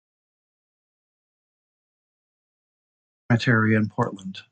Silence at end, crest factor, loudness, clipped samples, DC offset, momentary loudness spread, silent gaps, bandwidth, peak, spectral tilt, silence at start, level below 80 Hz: 0.1 s; 20 dB; -22 LUFS; under 0.1%; under 0.1%; 9 LU; none; 8.6 kHz; -8 dBFS; -7 dB/octave; 3.3 s; -62 dBFS